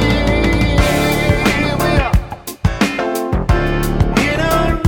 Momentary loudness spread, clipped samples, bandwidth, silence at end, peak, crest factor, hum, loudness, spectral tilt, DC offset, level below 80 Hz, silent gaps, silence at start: 5 LU; under 0.1%; 19.5 kHz; 0 s; 0 dBFS; 14 dB; none; -15 LUFS; -5.5 dB/octave; under 0.1%; -20 dBFS; none; 0 s